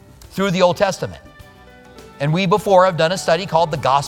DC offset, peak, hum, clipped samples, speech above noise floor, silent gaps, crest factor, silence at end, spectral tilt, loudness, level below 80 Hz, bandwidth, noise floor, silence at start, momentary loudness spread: under 0.1%; 0 dBFS; none; under 0.1%; 27 dB; none; 18 dB; 0 s; -5 dB/octave; -17 LUFS; -48 dBFS; 16.5 kHz; -43 dBFS; 0.3 s; 12 LU